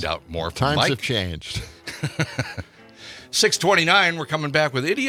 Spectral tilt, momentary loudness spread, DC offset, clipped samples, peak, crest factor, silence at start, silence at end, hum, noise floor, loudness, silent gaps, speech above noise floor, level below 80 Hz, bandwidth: -3.5 dB/octave; 15 LU; under 0.1%; under 0.1%; -2 dBFS; 20 dB; 0 s; 0 s; none; -44 dBFS; -21 LUFS; none; 22 dB; -48 dBFS; 16.5 kHz